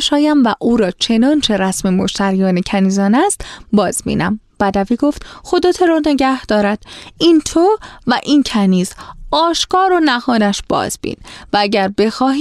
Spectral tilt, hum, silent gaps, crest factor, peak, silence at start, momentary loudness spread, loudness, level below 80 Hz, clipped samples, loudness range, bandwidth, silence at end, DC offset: -4.5 dB/octave; none; none; 14 dB; -2 dBFS; 0 s; 7 LU; -14 LUFS; -40 dBFS; under 0.1%; 2 LU; 13.5 kHz; 0 s; under 0.1%